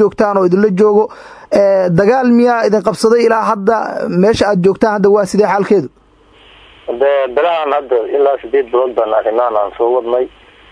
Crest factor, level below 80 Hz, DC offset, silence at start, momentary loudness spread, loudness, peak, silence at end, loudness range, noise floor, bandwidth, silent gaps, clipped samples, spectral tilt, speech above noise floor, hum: 12 dB; -48 dBFS; under 0.1%; 0 s; 6 LU; -12 LUFS; 0 dBFS; 0.45 s; 3 LU; -45 dBFS; 11 kHz; none; under 0.1%; -6.5 dB/octave; 34 dB; none